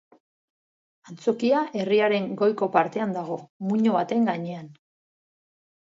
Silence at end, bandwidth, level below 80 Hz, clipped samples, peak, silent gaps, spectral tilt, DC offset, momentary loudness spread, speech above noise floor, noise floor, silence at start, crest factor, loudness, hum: 1.1 s; 7.6 kHz; -76 dBFS; under 0.1%; -6 dBFS; 3.50-3.60 s; -7 dB/octave; under 0.1%; 10 LU; over 66 dB; under -90 dBFS; 1.05 s; 20 dB; -24 LUFS; none